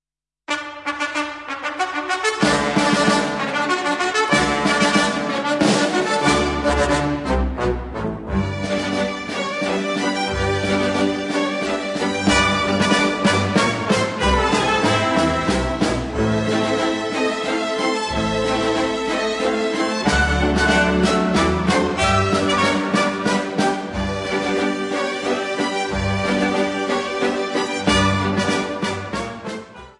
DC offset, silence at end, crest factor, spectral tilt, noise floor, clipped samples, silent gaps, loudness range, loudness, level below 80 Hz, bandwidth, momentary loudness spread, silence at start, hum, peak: under 0.1%; 0.1 s; 16 dB; -4.5 dB/octave; -42 dBFS; under 0.1%; none; 4 LU; -19 LUFS; -34 dBFS; 11.5 kHz; 7 LU; 0.5 s; none; -2 dBFS